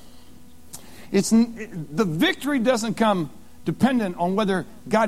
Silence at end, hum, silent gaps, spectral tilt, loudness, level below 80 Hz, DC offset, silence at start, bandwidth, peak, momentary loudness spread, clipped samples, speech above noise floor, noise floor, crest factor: 0 s; none; none; -5 dB/octave; -23 LUFS; -54 dBFS; 0.8%; 0.1 s; 15.5 kHz; -6 dBFS; 14 LU; under 0.1%; 27 dB; -49 dBFS; 18 dB